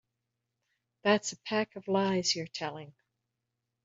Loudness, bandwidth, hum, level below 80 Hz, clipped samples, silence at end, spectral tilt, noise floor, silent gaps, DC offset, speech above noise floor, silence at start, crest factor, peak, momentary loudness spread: -31 LUFS; 8 kHz; none; -76 dBFS; under 0.1%; 0.95 s; -3.5 dB/octave; -85 dBFS; none; under 0.1%; 54 dB; 1.05 s; 22 dB; -12 dBFS; 10 LU